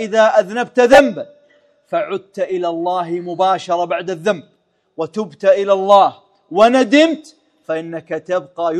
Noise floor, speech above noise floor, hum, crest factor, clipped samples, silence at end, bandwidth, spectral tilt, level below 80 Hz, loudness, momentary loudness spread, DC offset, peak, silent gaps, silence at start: -54 dBFS; 39 dB; none; 16 dB; 0.2%; 0 s; 12.5 kHz; -4.5 dB/octave; -56 dBFS; -15 LUFS; 14 LU; under 0.1%; 0 dBFS; none; 0 s